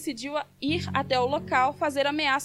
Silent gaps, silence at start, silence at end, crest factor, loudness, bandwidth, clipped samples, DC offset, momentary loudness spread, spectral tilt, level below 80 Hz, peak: none; 0 s; 0 s; 18 dB; -26 LUFS; 15.5 kHz; under 0.1%; under 0.1%; 7 LU; -4.5 dB/octave; -60 dBFS; -8 dBFS